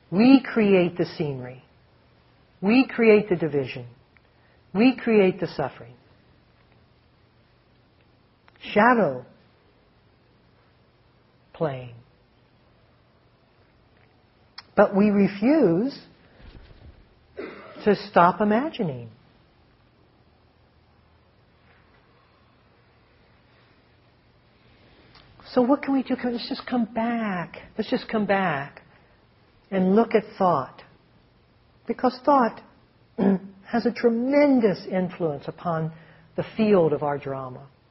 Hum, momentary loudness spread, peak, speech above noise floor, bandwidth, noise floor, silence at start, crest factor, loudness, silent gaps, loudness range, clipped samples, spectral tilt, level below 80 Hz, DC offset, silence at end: none; 18 LU; -2 dBFS; 38 dB; 5.8 kHz; -60 dBFS; 0.1 s; 24 dB; -23 LUFS; none; 15 LU; under 0.1%; -5.5 dB/octave; -60 dBFS; under 0.1%; 0.25 s